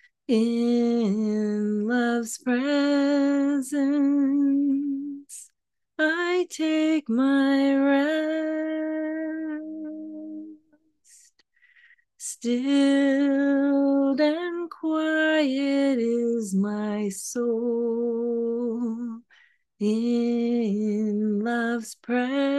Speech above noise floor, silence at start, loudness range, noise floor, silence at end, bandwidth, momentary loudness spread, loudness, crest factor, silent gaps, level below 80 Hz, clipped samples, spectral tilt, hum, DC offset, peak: 55 dB; 0.3 s; 6 LU; -78 dBFS; 0 s; 12.5 kHz; 11 LU; -24 LUFS; 14 dB; none; -78 dBFS; under 0.1%; -5 dB/octave; none; under 0.1%; -10 dBFS